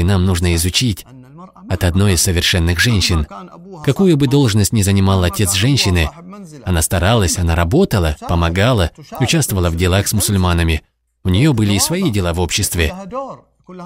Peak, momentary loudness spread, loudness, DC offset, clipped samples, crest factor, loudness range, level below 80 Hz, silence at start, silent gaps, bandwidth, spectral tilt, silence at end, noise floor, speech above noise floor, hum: -2 dBFS; 10 LU; -15 LUFS; under 0.1%; under 0.1%; 14 dB; 2 LU; -28 dBFS; 0 s; none; 16.5 kHz; -4.5 dB/octave; 0 s; -38 dBFS; 23 dB; none